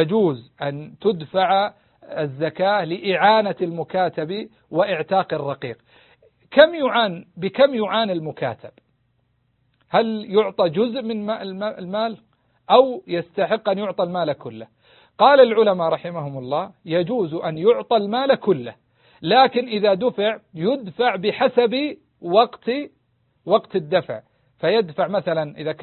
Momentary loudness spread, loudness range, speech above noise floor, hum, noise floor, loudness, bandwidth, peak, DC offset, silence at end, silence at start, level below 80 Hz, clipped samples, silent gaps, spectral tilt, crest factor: 13 LU; 4 LU; 47 dB; none; -66 dBFS; -20 LUFS; 4.4 kHz; 0 dBFS; under 0.1%; 0 s; 0 s; -66 dBFS; under 0.1%; none; -10.5 dB/octave; 20 dB